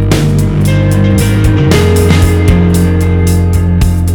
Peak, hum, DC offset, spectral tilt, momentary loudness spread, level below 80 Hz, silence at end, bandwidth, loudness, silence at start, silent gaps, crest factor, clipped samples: 0 dBFS; none; under 0.1%; -6.5 dB/octave; 2 LU; -16 dBFS; 0 s; 18.5 kHz; -9 LUFS; 0 s; none; 8 dB; 0.5%